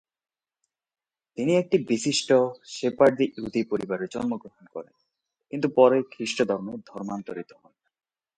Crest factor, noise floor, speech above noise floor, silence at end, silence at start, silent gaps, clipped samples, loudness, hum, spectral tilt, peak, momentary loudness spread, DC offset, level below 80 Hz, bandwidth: 22 dB; -81 dBFS; 57 dB; 0.95 s; 1.4 s; none; under 0.1%; -25 LUFS; none; -5 dB/octave; -4 dBFS; 19 LU; under 0.1%; -66 dBFS; 9.4 kHz